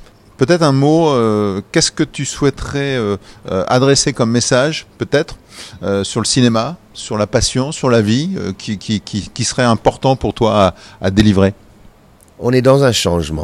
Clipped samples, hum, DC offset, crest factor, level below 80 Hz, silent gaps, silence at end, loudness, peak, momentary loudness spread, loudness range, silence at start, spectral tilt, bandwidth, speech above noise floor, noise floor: under 0.1%; none; under 0.1%; 14 dB; -38 dBFS; none; 0 s; -15 LUFS; 0 dBFS; 11 LU; 2 LU; 0 s; -5 dB/octave; 14.5 kHz; 32 dB; -46 dBFS